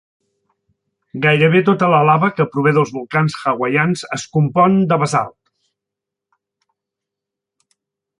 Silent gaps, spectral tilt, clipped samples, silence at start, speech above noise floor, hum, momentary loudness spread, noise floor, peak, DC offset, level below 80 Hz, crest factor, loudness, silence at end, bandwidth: none; -6.5 dB/octave; under 0.1%; 1.15 s; 69 dB; none; 8 LU; -83 dBFS; -2 dBFS; under 0.1%; -58 dBFS; 16 dB; -15 LUFS; 2.9 s; 11 kHz